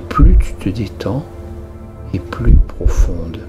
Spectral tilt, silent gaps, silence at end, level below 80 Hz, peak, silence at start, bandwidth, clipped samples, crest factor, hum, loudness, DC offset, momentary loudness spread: -7.5 dB/octave; none; 0 s; -14 dBFS; 0 dBFS; 0 s; 8 kHz; under 0.1%; 14 dB; none; -17 LUFS; under 0.1%; 19 LU